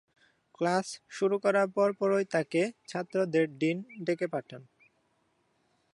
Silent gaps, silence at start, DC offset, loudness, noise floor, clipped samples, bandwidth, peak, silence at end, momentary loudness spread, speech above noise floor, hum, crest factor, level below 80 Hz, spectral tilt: none; 0.6 s; under 0.1%; -30 LUFS; -73 dBFS; under 0.1%; 11.5 kHz; -12 dBFS; 1.3 s; 11 LU; 44 dB; none; 18 dB; -84 dBFS; -5.5 dB/octave